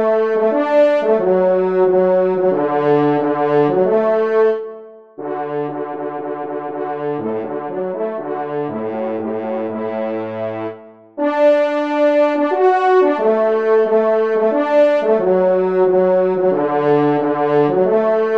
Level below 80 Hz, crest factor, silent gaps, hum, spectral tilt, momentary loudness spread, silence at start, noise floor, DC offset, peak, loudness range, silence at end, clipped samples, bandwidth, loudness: -68 dBFS; 12 dB; none; none; -8.5 dB/octave; 11 LU; 0 s; -36 dBFS; 0.3%; -4 dBFS; 9 LU; 0 s; under 0.1%; 6.6 kHz; -16 LUFS